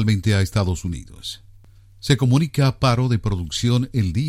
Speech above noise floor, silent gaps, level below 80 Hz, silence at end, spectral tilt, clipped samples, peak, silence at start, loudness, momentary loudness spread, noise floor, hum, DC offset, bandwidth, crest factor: 28 dB; none; -38 dBFS; 0 s; -6 dB/octave; under 0.1%; -4 dBFS; 0 s; -20 LUFS; 15 LU; -47 dBFS; none; under 0.1%; 14.5 kHz; 16 dB